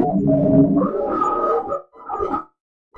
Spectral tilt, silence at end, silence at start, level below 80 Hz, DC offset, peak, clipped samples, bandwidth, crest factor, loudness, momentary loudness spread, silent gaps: -10.5 dB/octave; 0.55 s; 0 s; -46 dBFS; under 0.1%; -4 dBFS; under 0.1%; 7.4 kHz; 16 dB; -19 LUFS; 13 LU; none